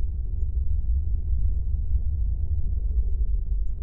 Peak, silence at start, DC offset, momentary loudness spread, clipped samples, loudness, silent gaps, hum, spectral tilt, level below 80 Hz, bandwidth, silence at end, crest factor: -12 dBFS; 0 s; under 0.1%; 2 LU; under 0.1%; -29 LUFS; none; none; -13.5 dB/octave; -24 dBFS; 0.8 kHz; 0 s; 10 dB